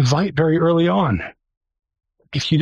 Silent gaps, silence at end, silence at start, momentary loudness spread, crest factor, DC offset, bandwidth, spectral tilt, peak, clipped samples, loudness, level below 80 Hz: 1.57-1.61 s; 0 s; 0 s; 11 LU; 14 dB; under 0.1%; 8.2 kHz; -6.5 dB/octave; -4 dBFS; under 0.1%; -18 LUFS; -46 dBFS